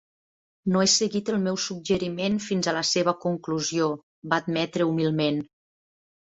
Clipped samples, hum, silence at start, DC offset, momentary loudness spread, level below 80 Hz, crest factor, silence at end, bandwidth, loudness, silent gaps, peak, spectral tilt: under 0.1%; none; 0.65 s; under 0.1%; 7 LU; -62 dBFS; 20 dB; 0.75 s; 8.2 kHz; -25 LUFS; 4.03-4.22 s; -6 dBFS; -4 dB/octave